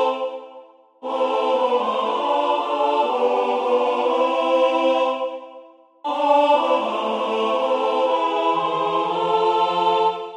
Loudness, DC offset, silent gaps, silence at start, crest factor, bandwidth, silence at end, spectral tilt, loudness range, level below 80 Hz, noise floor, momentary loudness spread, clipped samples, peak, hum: -20 LUFS; under 0.1%; none; 0 s; 14 dB; 9.6 kHz; 0 s; -4.5 dB/octave; 1 LU; -78 dBFS; -46 dBFS; 8 LU; under 0.1%; -6 dBFS; none